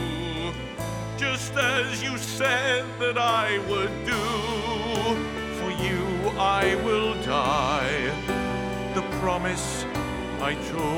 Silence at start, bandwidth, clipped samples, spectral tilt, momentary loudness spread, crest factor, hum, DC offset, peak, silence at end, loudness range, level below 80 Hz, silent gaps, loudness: 0 s; 19 kHz; under 0.1%; -4 dB/octave; 7 LU; 18 dB; none; under 0.1%; -8 dBFS; 0 s; 2 LU; -42 dBFS; none; -26 LUFS